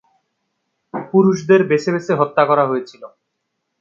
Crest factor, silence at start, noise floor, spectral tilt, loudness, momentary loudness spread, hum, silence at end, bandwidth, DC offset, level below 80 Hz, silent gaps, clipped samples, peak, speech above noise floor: 18 dB; 0.95 s; -74 dBFS; -7 dB/octave; -16 LUFS; 15 LU; none; 0.75 s; 7.4 kHz; under 0.1%; -66 dBFS; none; under 0.1%; 0 dBFS; 59 dB